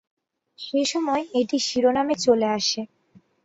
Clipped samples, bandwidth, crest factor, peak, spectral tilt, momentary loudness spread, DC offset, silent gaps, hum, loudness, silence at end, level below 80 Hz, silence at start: under 0.1%; 8 kHz; 18 dB; -6 dBFS; -3 dB/octave; 9 LU; under 0.1%; none; none; -23 LUFS; 0.6 s; -64 dBFS; 0.6 s